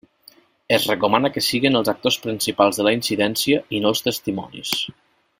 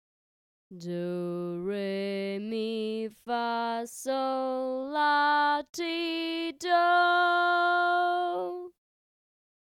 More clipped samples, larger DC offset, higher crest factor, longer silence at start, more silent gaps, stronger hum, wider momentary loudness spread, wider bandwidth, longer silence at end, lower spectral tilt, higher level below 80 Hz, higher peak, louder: neither; neither; first, 22 dB vs 16 dB; about the same, 0.7 s vs 0.7 s; neither; neither; second, 7 LU vs 11 LU; about the same, 16.5 kHz vs 16 kHz; second, 0.5 s vs 1 s; about the same, -3.5 dB/octave vs -4.5 dB/octave; first, -58 dBFS vs -78 dBFS; first, 0 dBFS vs -14 dBFS; first, -20 LUFS vs -28 LUFS